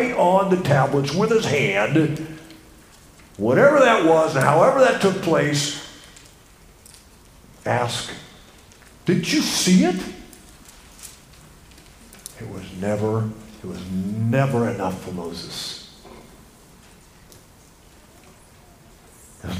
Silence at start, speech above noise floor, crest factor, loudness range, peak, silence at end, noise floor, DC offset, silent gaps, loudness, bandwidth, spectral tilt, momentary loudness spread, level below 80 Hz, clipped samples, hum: 0 s; 30 dB; 22 dB; 13 LU; 0 dBFS; 0 s; -50 dBFS; under 0.1%; none; -20 LUFS; 15.5 kHz; -5 dB/octave; 22 LU; -52 dBFS; under 0.1%; none